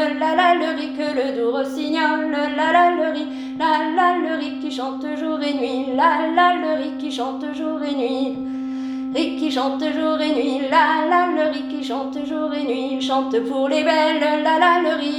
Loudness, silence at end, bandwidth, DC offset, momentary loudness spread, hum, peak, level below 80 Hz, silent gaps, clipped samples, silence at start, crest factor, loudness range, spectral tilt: -20 LUFS; 0 s; 11 kHz; under 0.1%; 10 LU; none; -4 dBFS; -62 dBFS; none; under 0.1%; 0 s; 16 dB; 3 LU; -3.5 dB/octave